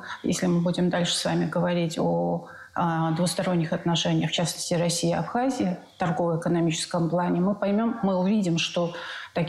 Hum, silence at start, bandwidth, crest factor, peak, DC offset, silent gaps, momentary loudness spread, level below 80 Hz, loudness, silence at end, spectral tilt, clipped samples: none; 0 s; 13 kHz; 12 dB; -14 dBFS; under 0.1%; none; 5 LU; -60 dBFS; -25 LUFS; 0 s; -5 dB/octave; under 0.1%